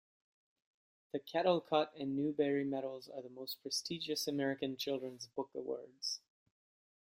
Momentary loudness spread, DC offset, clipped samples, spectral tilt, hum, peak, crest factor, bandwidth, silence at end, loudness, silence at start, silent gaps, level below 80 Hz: 12 LU; under 0.1%; under 0.1%; -4 dB/octave; none; -18 dBFS; 22 dB; 16 kHz; 0.85 s; -38 LUFS; 1.15 s; none; -82 dBFS